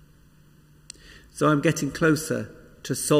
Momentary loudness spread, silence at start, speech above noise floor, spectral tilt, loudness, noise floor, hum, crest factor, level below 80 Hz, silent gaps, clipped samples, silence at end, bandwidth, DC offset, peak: 23 LU; 1.1 s; 32 dB; -5 dB/octave; -24 LUFS; -55 dBFS; none; 18 dB; -54 dBFS; none; under 0.1%; 0 s; 16 kHz; under 0.1%; -8 dBFS